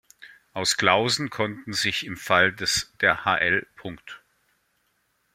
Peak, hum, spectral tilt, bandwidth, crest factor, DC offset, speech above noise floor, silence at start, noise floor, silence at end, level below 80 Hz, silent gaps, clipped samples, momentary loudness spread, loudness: -2 dBFS; none; -2.5 dB/octave; 16.5 kHz; 24 dB; under 0.1%; 46 dB; 0.2 s; -70 dBFS; 1.15 s; -60 dBFS; none; under 0.1%; 18 LU; -23 LUFS